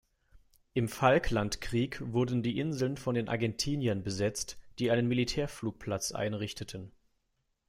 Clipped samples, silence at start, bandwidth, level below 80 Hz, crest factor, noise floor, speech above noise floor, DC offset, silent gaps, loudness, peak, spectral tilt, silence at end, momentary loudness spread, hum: under 0.1%; 0.35 s; 16 kHz; -50 dBFS; 20 dB; -79 dBFS; 47 dB; under 0.1%; none; -32 LUFS; -12 dBFS; -5 dB/octave; 0.8 s; 10 LU; none